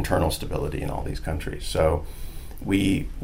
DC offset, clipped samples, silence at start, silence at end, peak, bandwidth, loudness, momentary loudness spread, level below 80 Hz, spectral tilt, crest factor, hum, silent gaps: 0.4%; under 0.1%; 0 s; 0 s; -6 dBFS; 16 kHz; -26 LUFS; 14 LU; -32 dBFS; -6 dB/octave; 18 dB; none; none